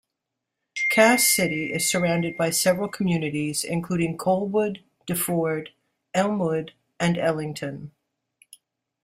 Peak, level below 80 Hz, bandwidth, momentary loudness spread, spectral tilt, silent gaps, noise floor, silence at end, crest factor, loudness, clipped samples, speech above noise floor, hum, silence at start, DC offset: -4 dBFS; -62 dBFS; 16 kHz; 14 LU; -4 dB/octave; none; -83 dBFS; 1.15 s; 22 dB; -23 LUFS; under 0.1%; 60 dB; none; 0.75 s; under 0.1%